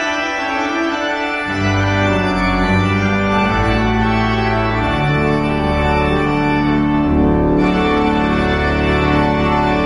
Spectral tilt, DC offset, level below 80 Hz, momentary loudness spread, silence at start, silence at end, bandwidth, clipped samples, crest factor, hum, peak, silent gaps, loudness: -6.5 dB/octave; under 0.1%; -26 dBFS; 3 LU; 0 s; 0 s; 10 kHz; under 0.1%; 12 dB; none; -2 dBFS; none; -15 LUFS